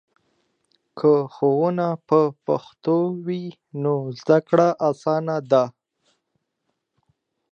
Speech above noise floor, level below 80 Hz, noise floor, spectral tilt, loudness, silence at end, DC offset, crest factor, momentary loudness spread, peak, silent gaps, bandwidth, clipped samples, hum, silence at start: 56 dB; -76 dBFS; -76 dBFS; -8 dB/octave; -21 LUFS; 1.8 s; under 0.1%; 20 dB; 9 LU; -2 dBFS; none; 7.2 kHz; under 0.1%; none; 0.95 s